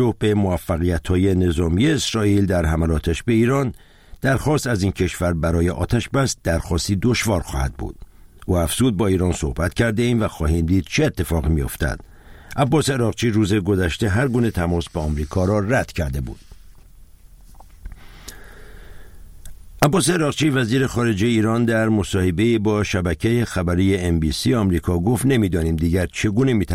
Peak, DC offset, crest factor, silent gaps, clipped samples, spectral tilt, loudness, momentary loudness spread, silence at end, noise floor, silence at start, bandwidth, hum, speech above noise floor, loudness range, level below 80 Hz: 0 dBFS; under 0.1%; 20 dB; none; under 0.1%; -6 dB/octave; -20 LUFS; 6 LU; 0 s; -44 dBFS; 0 s; 16.5 kHz; none; 26 dB; 5 LU; -32 dBFS